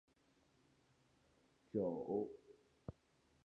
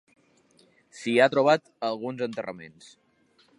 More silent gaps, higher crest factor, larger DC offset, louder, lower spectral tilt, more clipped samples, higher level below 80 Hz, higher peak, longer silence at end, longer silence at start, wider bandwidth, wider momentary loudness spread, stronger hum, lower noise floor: neither; about the same, 22 dB vs 22 dB; neither; second, -44 LUFS vs -25 LUFS; first, -9.5 dB/octave vs -5 dB/octave; neither; about the same, -76 dBFS vs -76 dBFS; second, -28 dBFS vs -6 dBFS; second, 0.55 s vs 0.9 s; first, 1.75 s vs 0.95 s; second, 8.8 kHz vs 11 kHz; second, 16 LU vs 19 LU; neither; first, -76 dBFS vs -64 dBFS